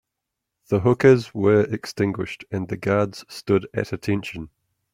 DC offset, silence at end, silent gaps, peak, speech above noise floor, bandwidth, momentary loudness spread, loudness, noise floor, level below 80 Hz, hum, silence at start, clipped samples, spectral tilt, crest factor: under 0.1%; 0.45 s; none; -2 dBFS; 61 dB; 15 kHz; 13 LU; -22 LUFS; -82 dBFS; -56 dBFS; none; 0.7 s; under 0.1%; -7 dB/octave; 20 dB